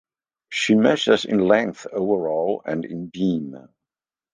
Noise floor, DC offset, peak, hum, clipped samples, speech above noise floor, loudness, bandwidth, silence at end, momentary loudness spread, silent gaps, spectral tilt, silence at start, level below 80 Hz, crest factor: -90 dBFS; under 0.1%; -2 dBFS; none; under 0.1%; 69 dB; -21 LUFS; 9.8 kHz; 0.75 s; 11 LU; none; -5.5 dB/octave; 0.5 s; -62 dBFS; 20 dB